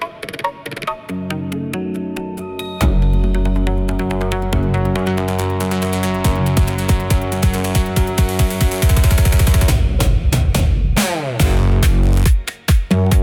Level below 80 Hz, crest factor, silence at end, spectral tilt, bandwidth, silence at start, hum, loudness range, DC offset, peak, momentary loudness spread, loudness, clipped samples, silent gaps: -18 dBFS; 12 dB; 0 s; -5.5 dB/octave; 18 kHz; 0 s; none; 5 LU; under 0.1%; -2 dBFS; 10 LU; -17 LUFS; under 0.1%; none